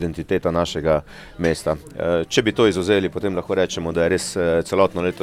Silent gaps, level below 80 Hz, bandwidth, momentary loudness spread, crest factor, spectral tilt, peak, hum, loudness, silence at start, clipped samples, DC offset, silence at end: none; -42 dBFS; 15.5 kHz; 6 LU; 20 dB; -5 dB/octave; -2 dBFS; none; -21 LUFS; 0 s; under 0.1%; under 0.1%; 0 s